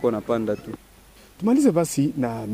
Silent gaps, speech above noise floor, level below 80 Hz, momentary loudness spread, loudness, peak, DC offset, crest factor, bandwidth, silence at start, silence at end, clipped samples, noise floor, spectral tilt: none; 28 dB; -54 dBFS; 14 LU; -23 LUFS; -8 dBFS; under 0.1%; 16 dB; 15.5 kHz; 0 s; 0 s; under 0.1%; -50 dBFS; -6.5 dB/octave